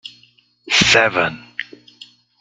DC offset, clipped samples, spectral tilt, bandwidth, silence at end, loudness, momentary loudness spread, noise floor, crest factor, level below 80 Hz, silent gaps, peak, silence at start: under 0.1%; under 0.1%; -2 dB/octave; 13 kHz; 0.75 s; -14 LUFS; 23 LU; -54 dBFS; 20 dB; -50 dBFS; none; 0 dBFS; 0.05 s